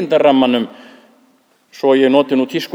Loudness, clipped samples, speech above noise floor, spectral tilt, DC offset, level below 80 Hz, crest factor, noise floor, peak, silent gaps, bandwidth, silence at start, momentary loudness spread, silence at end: -14 LUFS; under 0.1%; 41 dB; -6 dB/octave; under 0.1%; -66 dBFS; 16 dB; -55 dBFS; 0 dBFS; none; 15 kHz; 0 s; 8 LU; 0.05 s